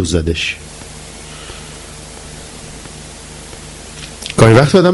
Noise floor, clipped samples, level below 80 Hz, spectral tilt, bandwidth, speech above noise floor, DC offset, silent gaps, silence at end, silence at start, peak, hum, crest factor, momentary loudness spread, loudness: -32 dBFS; 0.1%; -34 dBFS; -5.5 dB/octave; 12 kHz; 22 dB; under 0.1%; none; 0 s; 0 s; 0 dBFS; none; 16 dB; 23 LU; -12 LUFS